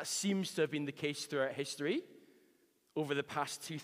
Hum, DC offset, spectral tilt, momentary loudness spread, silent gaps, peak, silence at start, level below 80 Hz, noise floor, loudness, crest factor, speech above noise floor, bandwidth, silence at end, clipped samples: none; under 0.1%; -4 dB/octave; 6 LU; none; -22 dBFS; 0 s; -86 dBFS; -72 dBFS; -37 LUFS; 18 dB; 35 dB; 15.5 kHz; 0 s; under 0.1%